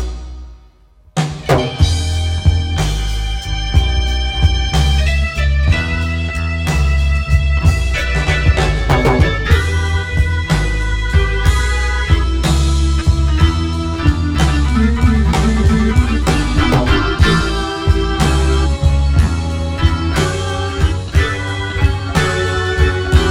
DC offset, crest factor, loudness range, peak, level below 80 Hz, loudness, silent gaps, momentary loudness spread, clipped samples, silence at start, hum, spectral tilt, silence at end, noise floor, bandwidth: under 0.1%; 14 dB; 2 LU; 0 dBFS; -16 dBFS; -15 LUFS; none; 5 LU; under 0.1%; 0 s; none; -5.5 dB/octave; 0 s; -46 dBFS; 13 kHz